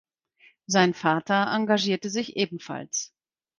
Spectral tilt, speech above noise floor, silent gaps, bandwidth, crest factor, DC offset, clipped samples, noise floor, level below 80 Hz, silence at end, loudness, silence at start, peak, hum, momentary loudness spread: -4 dB/octave; 35 dB; none; 10 kHz; 22 dB; under 0.1%; under 0.1%; -60 dBFS; -70 dBFS; 0.55 s; -25 LUFS; 0.7 s; -4 dBFS; none; 9 LU